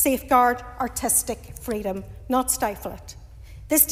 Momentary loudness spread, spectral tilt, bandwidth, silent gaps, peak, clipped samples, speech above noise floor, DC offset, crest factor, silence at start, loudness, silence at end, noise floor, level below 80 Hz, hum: 16 LU; -3 dB/octave; 16 kHz; none; -2 dBFS; under 0.1%; 17 dB; under 0.1%; 22 dB; 0 s; -23 LUFS; 0 s; -42 dBFS; -44 dBFS; none